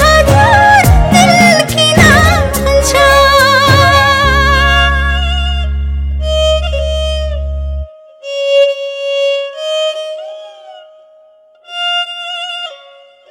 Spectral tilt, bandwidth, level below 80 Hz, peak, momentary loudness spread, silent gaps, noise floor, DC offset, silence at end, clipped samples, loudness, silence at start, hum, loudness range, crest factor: -4 dB/octave; 17 kHz; -18 dBFS; 0 dBFS; 16 LU; none; -44 dBFS; under 0.1%; 0.55 s; 1%; -9 LUFS; 0 s; none; 12 LU; 10 dB